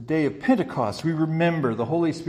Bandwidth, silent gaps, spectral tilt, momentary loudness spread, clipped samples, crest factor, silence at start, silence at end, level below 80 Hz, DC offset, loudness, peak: 11 kHz; none; -7.5 dB/octave; 3 LU; under 0.1%; 16 dB; 0 s; 0 s; -58 dBFS; under 0.1%; -24 LUFS; -8 dBFS